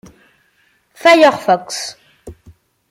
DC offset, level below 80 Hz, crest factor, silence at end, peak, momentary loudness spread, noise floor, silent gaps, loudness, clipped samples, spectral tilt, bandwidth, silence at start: under 0.1%; -54 dBFS; 16 dB; 0.6 s; 0 dBFS; 15 LU; -58 dBFS; none; -13 LUFS; under 0.1%; -3 dB/octave; 16 kHz; 1.05 s